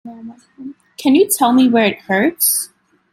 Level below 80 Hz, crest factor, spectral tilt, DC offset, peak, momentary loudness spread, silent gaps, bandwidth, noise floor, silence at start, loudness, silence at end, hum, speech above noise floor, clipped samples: -62 dBFS; 14 dB; -3 dB/octave; under 0.1%; -2 dBFS; 23 LU; none; 16.5 kHz; -36 dBFS; 0.05 s; -14 LUFS; 0.45 s; none; 22 dB; under 0.1%